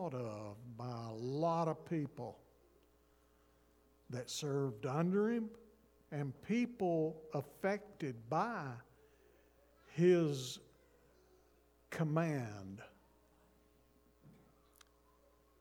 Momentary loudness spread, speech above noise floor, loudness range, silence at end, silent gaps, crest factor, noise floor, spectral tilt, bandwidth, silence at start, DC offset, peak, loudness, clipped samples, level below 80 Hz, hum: 15 LU; 33 dB; 6 LU; 1.3 s; none; 22 dB; -71 dBFS; -6.5 dB/octave; 19 kHz; 0 s; under 0.1%; -20 dBFS; -39 LUFS; under 0.1%; -74 dBFS; none